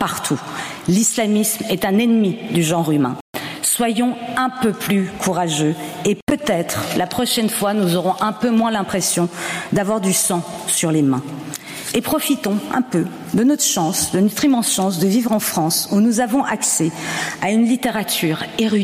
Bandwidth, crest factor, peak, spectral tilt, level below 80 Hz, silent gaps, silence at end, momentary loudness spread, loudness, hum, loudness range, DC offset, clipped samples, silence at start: 16 kHz; 14 dB; -4 dBFS; -4 dB/octave; -54 dBFS; 3.21-3.33 s, 6.22-6.27 s; 0 s; 6 LU; -18 LUFS; none; 2 LU; under 0.1%; under 0.1%; 0 s